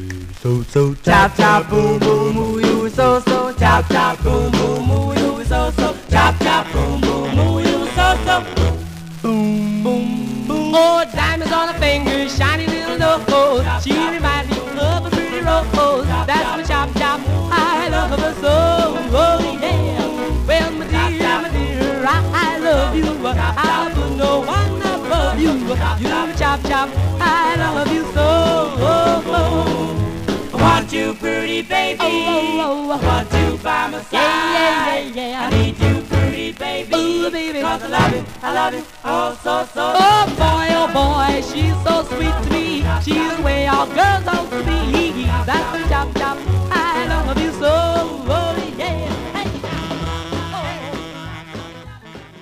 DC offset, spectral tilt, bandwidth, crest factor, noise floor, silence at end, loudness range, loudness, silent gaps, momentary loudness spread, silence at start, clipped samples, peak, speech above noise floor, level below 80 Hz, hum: 0.2%; -5.5 dB/octave; 15.5 kHz; 16 dB; -37 dBFS; 0 s; 3 LU; -17 LUFS; none; 8 LU; 0 s; under 0.1%; 0 dBFS; 21 dB; -26 dBFS; none